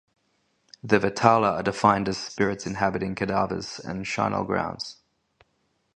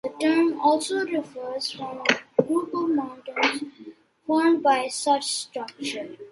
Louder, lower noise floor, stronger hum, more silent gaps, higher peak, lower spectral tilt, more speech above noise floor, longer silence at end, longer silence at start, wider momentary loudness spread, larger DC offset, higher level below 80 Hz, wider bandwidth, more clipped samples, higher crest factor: about the same, -25 LUFS vs -24 LUFS; first, -71 dBFS vs -46 dBFS; neither; neither; about the same, 0 dBFS vs -2 dBFS; first, -5.5 dB/octave vs -3 dB/octave; first, 47 dB vs 22 dB; first, 1.05 s vs 0 s; first, 0.85 s vs 0.05 s; about the same, 12 LU vs 12 LU; neither; first, -54 dBFS vs -74 dBFS; second, 10 kHz vs 11.5 kHz; neither; about the same, 26 dB vs 24 dB